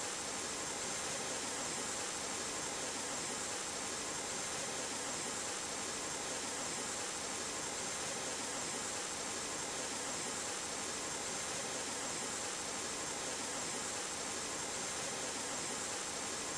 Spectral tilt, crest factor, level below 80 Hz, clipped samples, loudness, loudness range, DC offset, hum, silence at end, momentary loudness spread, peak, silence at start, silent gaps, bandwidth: -1 dB/octave; 14 dB; -68 dBFS; under 0.1%; -38 LUFS; 0 LU; under 0.1%; none; 0 s; 1 LU; -28 dBFS; 0 s; none; 11 kHz